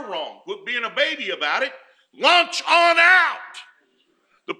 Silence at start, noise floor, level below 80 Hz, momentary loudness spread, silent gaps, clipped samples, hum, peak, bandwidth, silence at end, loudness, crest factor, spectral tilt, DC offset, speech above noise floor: 0 s; -64 dBFS; -82 dBFS; 19 LU; none; under 0.1%; none; -2 dBFS; 12 kHz; 0.05 s; -17 LUFS; 18 dB; -0.5 dB/octave; under 0.1%; 45 dB